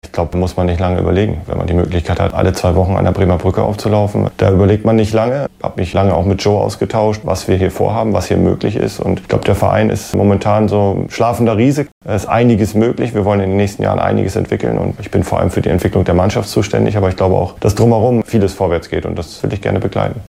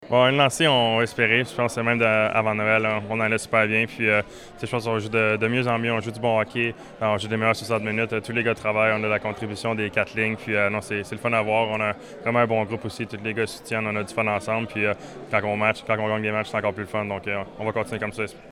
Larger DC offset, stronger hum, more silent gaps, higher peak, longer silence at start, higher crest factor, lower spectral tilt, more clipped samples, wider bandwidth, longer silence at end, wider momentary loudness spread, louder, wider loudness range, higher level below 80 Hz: neither; neither; first, 11.92-12.01 s vs none; first, 0 dBFS vs -4 dBFS; about the same, 0.05 s vs 0 s; second, 14 dB vs 20 dB; first, -7 dB/octave vs -5 dB/octave; neither; about the same, 15.5 kHz vs 15 kHz; about the same, 0 s vs 0 s; second, 6 LU vs 9 LU; first, -14 LUFS vs -23 LUFS; about the same, 2 LU vs 4 LU; first, -32 dBFS vs -58 dBFS